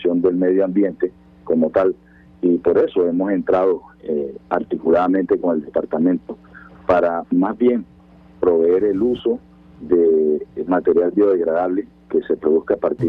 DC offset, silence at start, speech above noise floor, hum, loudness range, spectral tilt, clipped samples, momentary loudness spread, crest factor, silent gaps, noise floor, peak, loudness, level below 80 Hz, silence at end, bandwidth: under 0.1%; 0 s; 29 dB; none; 2 LU; -9.5 dB/octave; under 0.1%; 9 LU; 14 dB; none; -46 dBFS; -4 dBFS; -19 LUFS; -52 dBFS; 0 s; 4.5 kHz